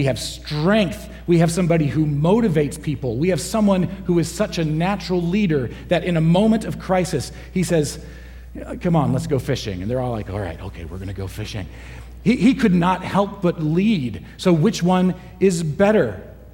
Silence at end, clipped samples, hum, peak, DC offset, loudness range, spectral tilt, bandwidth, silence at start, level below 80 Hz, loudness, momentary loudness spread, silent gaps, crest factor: 0.05 s; under 0.1%; none; -4 dBFS; under 0.1%; 5 LU; -6.5 dB/octave; 16.5 kHz; 0 s; -38 dBFS; -20 LUFS; 13 LU; none; 14 dB